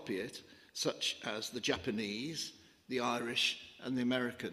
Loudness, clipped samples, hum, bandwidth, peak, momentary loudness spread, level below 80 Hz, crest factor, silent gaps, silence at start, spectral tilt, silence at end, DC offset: -37 LUFS; under 0.1%; none; 15.5 kHz; -18 dBFS; 11 LU; -74 dBFS; 20 dB; none; 0 s; -3 dB/octave; 0 s; under 0.1%